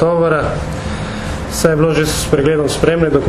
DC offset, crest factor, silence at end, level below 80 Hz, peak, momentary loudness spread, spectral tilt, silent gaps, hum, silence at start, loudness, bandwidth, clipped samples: under 0.1%; 14 dB; 0 s; -28 dBFS; 0 dBFS; 9 LU; -5.5 dB/octave; none; none; 0 s; -15 LUFS; 14 kHz; under 0.1%